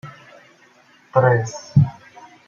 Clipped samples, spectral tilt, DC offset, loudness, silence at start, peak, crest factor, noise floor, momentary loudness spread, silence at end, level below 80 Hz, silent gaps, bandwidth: under 0.1%; -7.5 dB/octave; under 0.1%; -19 LUFS; 0.05 s; -2 dBFS; 18 dB; -53 dBFS; 6 LU; 0.55 s; -54 dBFS; none; 7.2 kHz